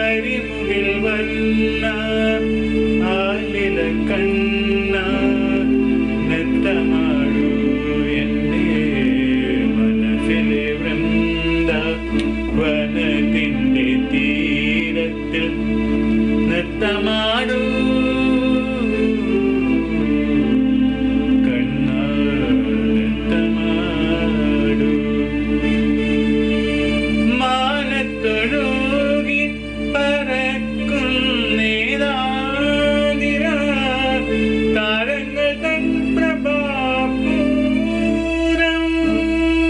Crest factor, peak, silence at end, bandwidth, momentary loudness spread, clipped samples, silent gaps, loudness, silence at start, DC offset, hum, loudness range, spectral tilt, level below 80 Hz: 10 dB; -6 dBFS; 0 s; 10 kHz; 3 LU; under 0.1%; none; -18 LUFS; 0 s; under 0.1%; none; 1 LU; -6.5 dB/octave; -32 dBFS